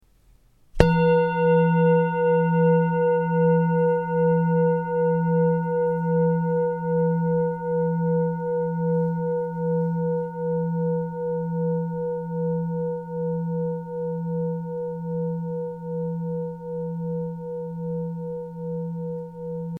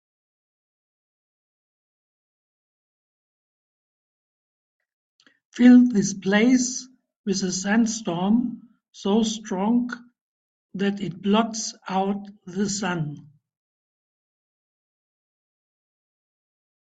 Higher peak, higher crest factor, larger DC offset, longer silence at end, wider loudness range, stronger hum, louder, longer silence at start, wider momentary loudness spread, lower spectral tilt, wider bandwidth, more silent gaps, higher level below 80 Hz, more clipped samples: first, 0 dBFS vs -4 dBFS; about the same, 22 dB vs 22 dB; neither; second, 0 s vs 3.65 s; about the same, 10 LU vs 11 LU; neither; about the same, -24 LUFS vs -22 LUFS; second, 0.75 s vs 5.55 s; second, 11 LU vs 16 LU; first, -10 dB/octave vs -4.5 dB/octave; second, 4.9 kHz vs 8.4 kHz; second, none vs 7.16-7.24 s, 10.21-10.69 s; first, -46 dBFS vs -66 dBFS; neither